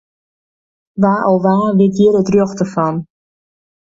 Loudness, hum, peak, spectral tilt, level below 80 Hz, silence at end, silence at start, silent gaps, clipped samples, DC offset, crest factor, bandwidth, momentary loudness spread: -14 LUFS; none; 0 dBFS; -8 dB/octave; -52 dBFS; 0.8 s; 0.95 s; none; under 0.1%; under 0.1%; 14 dB; 7.8 kHz; 8 LU